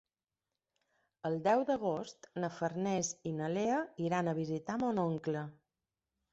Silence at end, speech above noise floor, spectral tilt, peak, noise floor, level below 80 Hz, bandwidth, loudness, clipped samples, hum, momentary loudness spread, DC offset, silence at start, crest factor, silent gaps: 0.8 s; over 55 dB; -6 dB/octave; -18 dBFS; under -90 dBFS; -74 dBFS; 8 kHz; -36 LUFS; under 0.1%; none; 9 LU; under 0.1%; 1.25 s; 18 dB; none